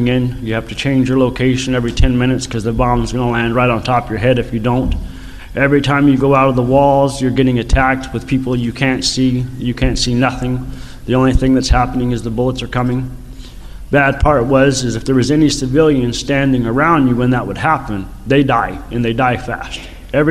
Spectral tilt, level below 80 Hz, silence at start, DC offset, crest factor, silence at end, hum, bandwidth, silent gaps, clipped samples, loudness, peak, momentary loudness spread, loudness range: -6 dB/octave; -26 dBFS; 0 s; under 0.1%; 14 dB; 0 s; none; 13 kHz; none; under 0.1%; -14 LUFS; 0 dBFS; 9 LU; 3 LU